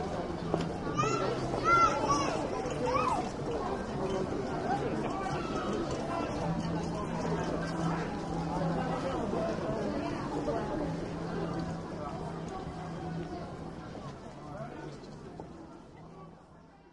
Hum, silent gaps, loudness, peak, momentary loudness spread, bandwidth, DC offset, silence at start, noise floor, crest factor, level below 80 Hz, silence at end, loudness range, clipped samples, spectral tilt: none; none; -33 LUFS; -12 dBFS; 15 LU; 11.5 kHz; under 0.1%; 0 s; -56 dBFS; 22 dB; -50 dBFS; 0.05 s; 12 LU; under 0.1%; -6 dB/octave